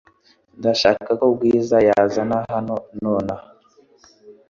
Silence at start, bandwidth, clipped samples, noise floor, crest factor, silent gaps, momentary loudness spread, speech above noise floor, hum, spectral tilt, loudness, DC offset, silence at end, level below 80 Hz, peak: 0.6 s; 7.4 kHz; under 0.1%; -56 dBFS; 18 dB; none; 10 LU; 38 dB; none; -5.5 dB/octave; -19 LUFS; under 0.1%; 0.2 s; -54 dBFS; -2 dBFS